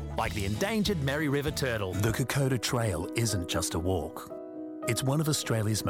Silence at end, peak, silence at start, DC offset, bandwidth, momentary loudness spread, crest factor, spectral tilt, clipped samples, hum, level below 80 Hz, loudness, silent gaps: 0 s; -16 dBFS; 0 s; under 0.1%; 18.5 kHz; 7 LU; 14 dB; -4.5 dB/octave; under 0.1%; none; -46 dBFS; -29 LUFS; none